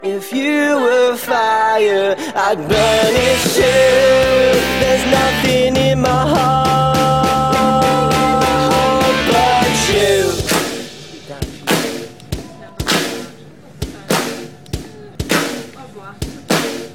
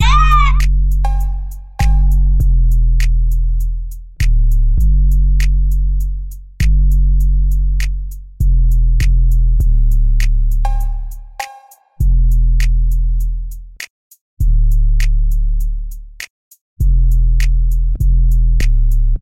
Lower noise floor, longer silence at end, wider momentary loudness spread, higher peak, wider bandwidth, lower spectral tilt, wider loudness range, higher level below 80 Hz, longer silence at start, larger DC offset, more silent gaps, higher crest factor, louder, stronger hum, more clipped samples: about the same, -38 dBFS vs -41 dBFS; about the same, 0 s vs 0 s; about the same, 16 LU vs 14 LU; about the same, -2 dBFS vs 0 dBFS; first, 17.5 kHz vs 7.6 kHz; second, -4 dB/octave vs -5.5 dB/octave; first, 9 LU vs 4 LU; second, -36 dBFS vs -12 dBFS; about the same, 0 s vs 0 s; second, 0.5% vs 2%; second, none vs 13.90-14.11 s, 14.21-14.37 s, 16.30-16.51 s, 16.61-16.76 s; about the same, 12 dB vs 10 dB; about the same, -14 LUFS vs -16 LUFS; neither; neither